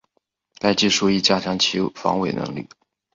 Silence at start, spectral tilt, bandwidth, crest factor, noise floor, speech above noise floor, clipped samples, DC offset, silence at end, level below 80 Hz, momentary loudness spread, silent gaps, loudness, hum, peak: 0.65 s; -3.5 dB/octave; 7.6 kHz; 18 dB; -71 dBFS; 51 dB; under 0.1%; under 0.1%; 0.5 s; -56 dBFS; 10 LU; none; -20 LUFS; none; -4 dBFS